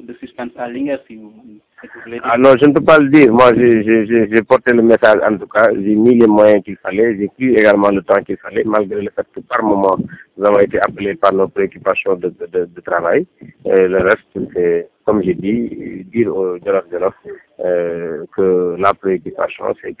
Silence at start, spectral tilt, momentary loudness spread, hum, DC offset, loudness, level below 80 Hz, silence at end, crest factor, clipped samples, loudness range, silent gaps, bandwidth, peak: 0.05 s; -10.5 dB/octave; 14 LU; none; under 0.1%; -14 LUFS; -48 dBFS; 0.05 s; 14 dB; under 0.1%; 8 LU; none; 4 kHz; 0 dBFS